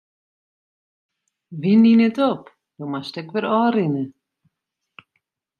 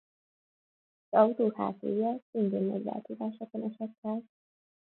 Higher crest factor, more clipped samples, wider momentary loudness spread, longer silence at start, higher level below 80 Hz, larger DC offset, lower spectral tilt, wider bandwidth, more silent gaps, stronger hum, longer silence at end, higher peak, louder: second, 16 dB vs 24 dB; neither; first, 18 LU vs 12 LU; first, 1.5 s vs 1.1 s; first, -72 dBFS vs -80 dBFS; neither; second, -8.5 dB/octave vs -11.5 dB/octave; first, 5 kHz vs 4.2 kHz; second, none vs 2.22-2.33 s, 3.98-4.03 s; neither; first, 1.5 s vs 0.65 s; first, -6 dBFS vs -10 dBFS; first, -19 LUFS vs -32 LUFS